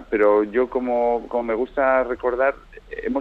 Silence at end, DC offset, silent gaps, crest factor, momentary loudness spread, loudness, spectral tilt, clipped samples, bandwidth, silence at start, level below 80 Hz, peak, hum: 0 s; under 0.1%; none; 14 dB; 10 LU; -21 LUFS; -7.5 dB/octave; under 0.1%; 5 kHz; 0 s; -46 dBFS; -6 dBFS; none